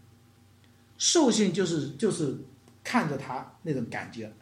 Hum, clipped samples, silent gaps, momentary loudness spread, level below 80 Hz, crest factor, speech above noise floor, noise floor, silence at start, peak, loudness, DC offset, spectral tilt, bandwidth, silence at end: none; under 0.1%; none; 15 LU; -72 dBFS; 18 dB; 30 dB; -58 dBFS; 1 s; -10 dBFS; -28 LUFS; under 0.1%; -4 dB/octave; 15 kHz; 0.1 s